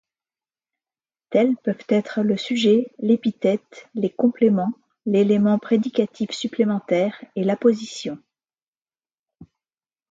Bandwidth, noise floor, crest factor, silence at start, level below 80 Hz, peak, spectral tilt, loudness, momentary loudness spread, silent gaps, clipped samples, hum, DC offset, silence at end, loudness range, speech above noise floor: 7.8 kHz; under -90 dBFS; 16 dB; 1.3 s; -68 dBFS; -6 dBFS; -6.5 dB/octave; -21 LUFS; 10 LU; 8.62-8.73 s, 8.81-8.85 s, 9.19-9.26 s; under 0.1%; none; under 0.1%; 0.65 s; 4 LU; over 70 dB